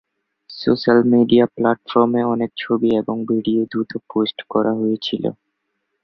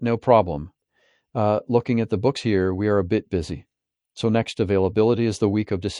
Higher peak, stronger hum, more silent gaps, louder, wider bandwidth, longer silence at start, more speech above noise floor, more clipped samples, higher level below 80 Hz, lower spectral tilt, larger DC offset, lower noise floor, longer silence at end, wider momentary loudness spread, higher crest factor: about the same, -2 dBFS vs -2 dBFS; neither; neither; first, -18 LUFS vs -22 LUFS; second, 6 kHz vs 11.5 kHz; first, 0.5 s vs 0 s; first, 56 dB vs 44 dB; neither; second, -60 dBFS vs -52 dBFS; about the same, -8 dB/octave vs -7 dB/octave; neither; first, -74 dBFS vs -66 dBFS; first, 0.7 s vs 0 s; about the same, 10 LU vs 10 LU; about the same, 16 dB vs 20 dB